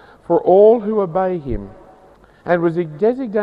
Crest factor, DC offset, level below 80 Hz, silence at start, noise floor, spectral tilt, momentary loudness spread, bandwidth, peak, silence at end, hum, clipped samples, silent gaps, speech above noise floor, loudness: 16 dB; under 0.1%; -42 dBFS; 0.3 s; -47 dBFS; -10 dB/octave; 15 LU; 4.9 kHz; -2 dBFS; 0 s; none; under 0.1%; none; 32 dB; -16 LUFS